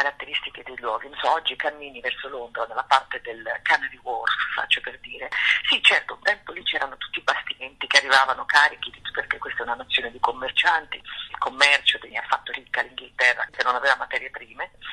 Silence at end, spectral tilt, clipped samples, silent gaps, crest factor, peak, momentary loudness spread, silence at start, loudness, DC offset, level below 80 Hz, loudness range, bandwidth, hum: 0 s; 0 dB/octave; under 0.1%; none; 24 dB; 0 dBFS; 15 LU; 0 s; -22 LUFS; under 0.1%; -60 dBFS; 4 LU; 12 kHz; none